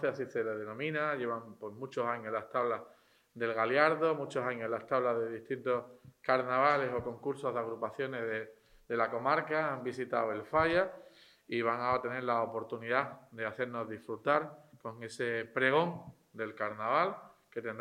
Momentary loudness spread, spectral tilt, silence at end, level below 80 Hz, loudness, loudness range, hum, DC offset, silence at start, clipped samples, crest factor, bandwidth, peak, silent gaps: 13 LU; -6 dB/octave; 0 s; -70 dBFS; -34 LUFS; 3 LU; none; under 0.1%; 0 s; under 0.1%; 24 dB; 13.5 kHz; -12 dBFS; none